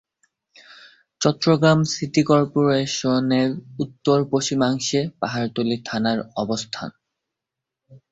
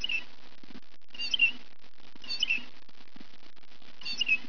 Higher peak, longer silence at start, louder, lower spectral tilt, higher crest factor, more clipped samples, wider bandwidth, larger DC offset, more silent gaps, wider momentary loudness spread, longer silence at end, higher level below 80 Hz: first, -2 dBFS vs -14 dBFS; first, 1.2 s vs 0 s; first, -21 LUFS vs -29 LUFS; first, -5.5 dB/octave vs -0.5 dB/octave; about the same, 20 dB vs 20 dB; neither; first, 8 kHz vs 5.4 kHz; second, under 0.1% vs 2%; neither; second, 8 LU vs 26 LU; first, 0.15 s vs 0 s; first, -58 dBFS vs -70 dBFS